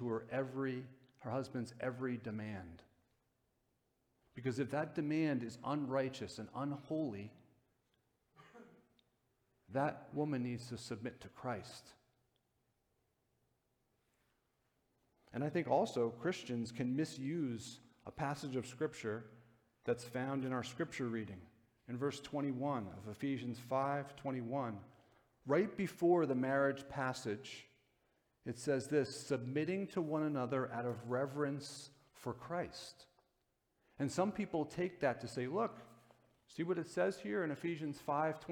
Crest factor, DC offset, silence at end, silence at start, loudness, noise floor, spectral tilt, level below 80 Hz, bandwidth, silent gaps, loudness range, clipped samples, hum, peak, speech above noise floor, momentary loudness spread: 20 dB; under 0.1%; 0 s; 0 s; -40 LUFS; -83 dBFS; -6.5 dB/octave; -76 dBFS; 17.5 kHz; none; 8 LU; under 0.1%; none; -20 dBFS; 43 dB; 13 LU